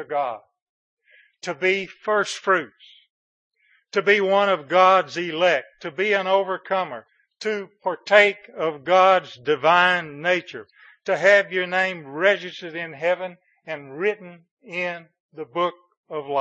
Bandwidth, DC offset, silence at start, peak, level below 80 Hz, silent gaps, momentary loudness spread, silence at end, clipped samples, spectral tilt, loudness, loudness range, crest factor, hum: 9.4 kHz; under 0.1%; 0 s; 0 dBFS; -80 dBFS; 0.62-0.97 s, 3.10-3.51 s, 14.51-14.57 s, 15.20-15.29 s, 15.97-16.04 s; 18 LU; 0 s; under 0.1%; -4 dB/octave; -21 LUFS; 7 LU; 22 dB; none